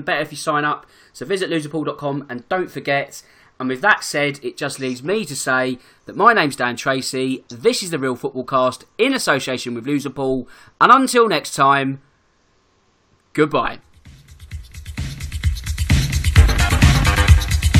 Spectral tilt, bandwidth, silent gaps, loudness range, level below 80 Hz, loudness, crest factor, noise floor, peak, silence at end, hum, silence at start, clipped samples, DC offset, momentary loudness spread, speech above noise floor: -5 dB/octave; 17 kHz; none; 7 LU; -26 dBFS; -18 LUFS; 18 dB; -60 dBFS; 0 dBFS; 0 s; none; 0 s; under 0.1%; under 0.1%; 15 LU; 41 dB